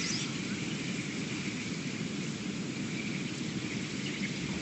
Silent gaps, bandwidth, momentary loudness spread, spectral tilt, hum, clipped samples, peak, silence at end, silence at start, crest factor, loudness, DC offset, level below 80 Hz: none; 8.8 kHz; 2 LU; -4 dB/octave; none; under 0.1%; -22 dBFS; 0 s; 0 s; 14 dB; -35 LUFS; under 0.1%; -62 dBFS